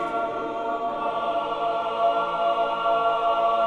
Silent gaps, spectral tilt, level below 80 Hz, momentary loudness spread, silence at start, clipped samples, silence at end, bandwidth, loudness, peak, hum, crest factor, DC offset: none; -5 dB/octave; -58 dBFS; 5 LU; 0 s; under 0.1%; 0 s; 8.8 kHz; -24 LUFS; -10 dBFS; none; 14 dB; under 0.1%